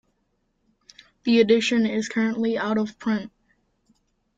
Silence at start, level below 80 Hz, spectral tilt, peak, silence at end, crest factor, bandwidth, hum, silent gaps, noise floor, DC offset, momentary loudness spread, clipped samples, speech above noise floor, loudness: 1.25 s; -64 dBFS; -5 dB/octave; -6 dBFS; 1.1 s; 18 dB; 7.8 kHz; none; none; -71 dBFS; under 0.1%; 10 LU; under 0.1%; 50 dB; -23 LUFS